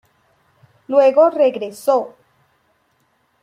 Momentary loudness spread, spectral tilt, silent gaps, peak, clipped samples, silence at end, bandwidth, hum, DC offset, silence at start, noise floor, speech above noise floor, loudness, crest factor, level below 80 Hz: 9 LU; -5 dB/octave; none; -2 dBFS; under 0.1%; 1.35 s; 15 kHz; none; under 0.1%; 0.9 s; -63 dBFS; 48 dB; -16 LUFS; 18 dB; -72 dBFS